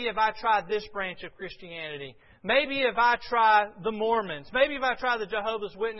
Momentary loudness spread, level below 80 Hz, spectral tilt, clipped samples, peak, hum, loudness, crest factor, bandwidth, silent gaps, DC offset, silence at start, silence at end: 16 LU; -56 dBFS; -5.5 dB/octave; under 0.1%; -10 dBFS; none; -26 LUFS; 18 dB; 6 kHz; none; under 0.1%; 0 s; 0 s